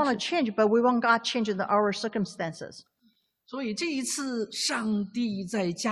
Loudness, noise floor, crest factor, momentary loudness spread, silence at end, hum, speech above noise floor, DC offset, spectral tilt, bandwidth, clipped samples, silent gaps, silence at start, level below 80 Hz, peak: -27 LUFS; -69 dBFS; 20 dB; 12 LU; 0 s; none; 41 dB; under 0.1%; -4 dB/octave; 13 kHz; under 0.1%; none; 0 s; -70 dBFS; -8 dBFS